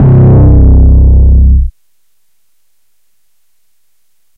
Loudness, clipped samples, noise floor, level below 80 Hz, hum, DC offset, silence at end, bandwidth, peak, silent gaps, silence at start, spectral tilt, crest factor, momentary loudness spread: -6 LUFS; under 0.1%; -62 dBFS; -8 dBFS; none; under 0.1%; 2.65 s; 1.9 kHz; 0 dBFS; none; 0 s; -13 dB/octave; 6 dB; 6 LU